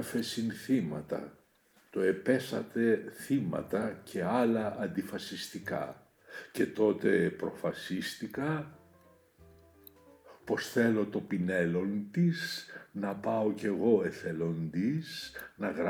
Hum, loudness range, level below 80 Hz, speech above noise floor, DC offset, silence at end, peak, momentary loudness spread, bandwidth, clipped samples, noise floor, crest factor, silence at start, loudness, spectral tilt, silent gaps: none; 4 LU; -70 dBFS; 35 dB; under 0.1%; 0 s; -14 dBFS; 11 LU; over 20 kHz; under 0.1%; -67 dBFS; 18 dB; 0 s; -33 LUFS; -6 dB/octave; none